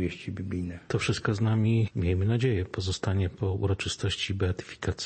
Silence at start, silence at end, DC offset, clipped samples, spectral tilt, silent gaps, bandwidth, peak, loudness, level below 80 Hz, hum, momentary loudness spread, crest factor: 0 s; 0 s; under 0.1%; under 0.1%; -6 dB/octave; none; 8.8 kHz; -14 dBFS; -29 LUFS; -48 dBFS; none; 8 LU; 14 dB